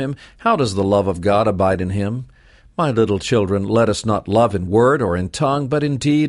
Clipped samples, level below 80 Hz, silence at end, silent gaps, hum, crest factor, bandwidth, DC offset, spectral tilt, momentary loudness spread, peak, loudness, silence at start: under 0.1%; -44 dBFS; 0 s; none; none; 14 dB; 11.5 kHz; under 0.1%; -6.5 dB/octave; 6 LU; -4 dBFS; -18 LUFS; 0 s